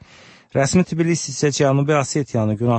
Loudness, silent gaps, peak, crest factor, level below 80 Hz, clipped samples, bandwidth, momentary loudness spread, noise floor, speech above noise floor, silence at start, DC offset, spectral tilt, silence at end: -19 LUFS; none; -4 dBFS; 14 dB; -50 dBFS; under 0.1%; 8.8 kHz; 4 LU; -47 dBFS; 29 dB; 0.55 s; under 0.1%; -5.5 dB/octave; 0 s